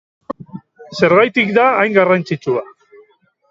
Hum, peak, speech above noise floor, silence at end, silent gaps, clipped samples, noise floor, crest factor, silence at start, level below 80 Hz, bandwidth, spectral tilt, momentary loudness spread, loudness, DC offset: none; 0 dBFS; 40 dB; 0.85 s; none; under 0.1%; -53 dBFS; 16 dB; 0.3 s; -60 dBFS; 7.8 kHz; -6.5 dB/octave; 20 LU; -14 LUFS; under 0.1%